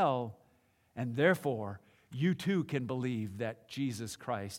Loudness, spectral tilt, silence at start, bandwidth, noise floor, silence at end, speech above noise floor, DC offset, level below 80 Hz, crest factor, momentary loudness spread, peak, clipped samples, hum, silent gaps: -35 LUFS; -6.5 dB/octave; 0 s; 16.5 kHz; -70 dBFS; 0 s; 36 dB; under 0.1%; -76 dBFS; 20 dB; 15 LU; -14 dBFS; under 0.1%; none; none